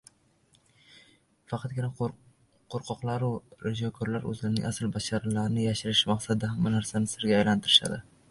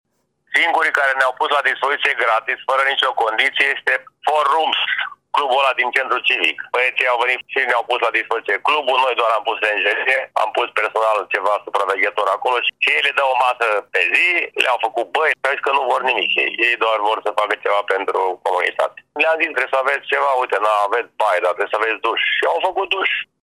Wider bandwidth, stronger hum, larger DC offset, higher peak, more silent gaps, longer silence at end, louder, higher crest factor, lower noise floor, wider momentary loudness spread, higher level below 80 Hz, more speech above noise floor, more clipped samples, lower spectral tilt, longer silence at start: second, 11.5 kHz vs 15.5 kHz; neither; neither; second, -6 dBFS vs -2 dBFS; neither; about the same, 0.3 s vs 0.2 s; second, -28 LUFS vs -17 LUFS; first, 24 dB vs 16 dB; first, -66 dBFS vs -50 dBFS; first, 13 LU vs 4 LU; first, -58 dBFS vs -76 dBFS; first, 37 dB vs 32 dB; neither; first, -4.5 dB/octave vs -0.5 dB/octave; first, 1.5 s vs 0.5 s